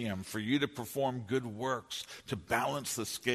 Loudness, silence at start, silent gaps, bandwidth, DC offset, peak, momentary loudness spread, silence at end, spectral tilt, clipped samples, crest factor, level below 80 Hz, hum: -35 LUFS; 0 s; none; 13.5 kHz; under 0.1%; -14 dBFS; 9 LU; 0 s; -4 dB/octave; under 0.1%; 20 dB; -66 dBFS; none